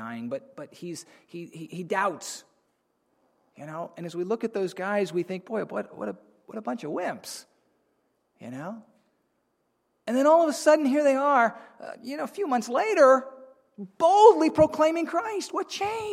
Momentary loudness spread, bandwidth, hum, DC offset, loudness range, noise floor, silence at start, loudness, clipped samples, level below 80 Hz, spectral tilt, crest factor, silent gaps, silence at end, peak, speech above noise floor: 22 LU; 15 kHz; none; under 0.1%; 15 LU; -74 dBFS; 0 s; -24 LUFS; under 0.1%; -66 dBFS; -4.5 dB/octave; 22 dB; none; 0 s; -4 dBFS; 49 dB